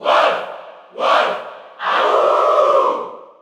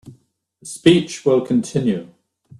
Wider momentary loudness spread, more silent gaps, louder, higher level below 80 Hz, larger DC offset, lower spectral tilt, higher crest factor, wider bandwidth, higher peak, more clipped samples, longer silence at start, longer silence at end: first, 19 LU vs 15 LU; neither; about the same, -16 LUFS vs -18 LUFS; second, -78 dBFS vs -56 dBFS; neither; second, -2.5 dB/octave vs -5.5 dB/octave; about the same, 16 dB vs 20 dB; second, 11 kHz vs 12.5 kHz; about the same, -2 dBFS vs 0 dBFS; neither; about the same, 0 s vs 0.05 s; second, 0.15 s vs 0.55 s